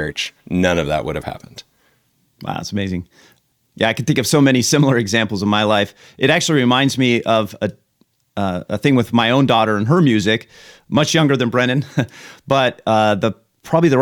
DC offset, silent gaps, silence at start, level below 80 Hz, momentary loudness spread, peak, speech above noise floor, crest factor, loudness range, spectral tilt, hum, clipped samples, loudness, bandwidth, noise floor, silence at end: under 0.1%; none; 0 s; -48 dBFS; 12 LU; -2 dBFS; 45 dB; 16 dB; 8 LU; -5 dB/octave; none; under 0.1%; -17 LUFS; 18 kHz; -62 dBFS; 0 s